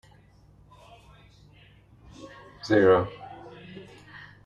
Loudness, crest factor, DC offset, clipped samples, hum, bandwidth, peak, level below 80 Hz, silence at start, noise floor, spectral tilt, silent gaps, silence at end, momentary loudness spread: -22 LUFS; 22 dB; under 0.1%; under 0.1%; 50 Hz at -55 dBFS; 7.4 kHz; -8 dBFS; -58 dBFS; 2.25 s; -56 dBFS; -7 dB/octave; none; 0.65 s; 27 LU